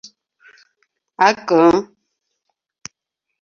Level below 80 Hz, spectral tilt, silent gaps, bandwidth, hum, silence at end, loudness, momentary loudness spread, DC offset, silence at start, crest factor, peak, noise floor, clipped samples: -58 dBFS; -5 dB/octave; none; 7.4 kHz; none; 1.55 s; -15 LUFS; 25 LU; under 0.1%; 1.2 s; 20 dB; -2 dBFS; -80 dBFS; under 0.1%